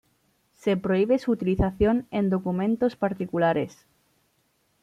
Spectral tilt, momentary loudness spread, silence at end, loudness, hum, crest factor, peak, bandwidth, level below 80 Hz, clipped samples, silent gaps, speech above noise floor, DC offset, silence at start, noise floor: -8 dB/octave; 6 LU; 1.15 s; -25 LUFS; none; 16 dB; -10 dBFS; 10 kHz; -44 dBFS; under 0.1%; none; 45 dB; under 0.1%; 0.65 s; -69 dBFS